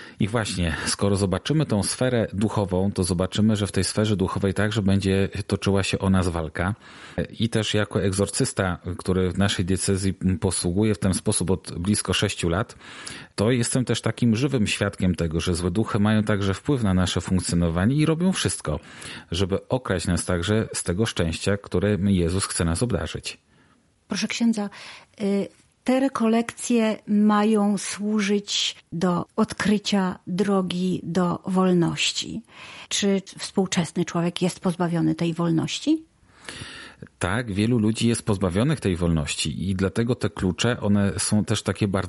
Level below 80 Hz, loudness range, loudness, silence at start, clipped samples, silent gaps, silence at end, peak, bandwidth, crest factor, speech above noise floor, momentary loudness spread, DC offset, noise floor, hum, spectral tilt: -48 dBFS; 3 LU; -24 LUFS; 0 s; under 0.1%; none; 0 s; -6 dBFS; 11.5 kHz; 16 dB; 37 dB; 7 LU; under 0.1%; -60 dBFS; none; -5 dB/octave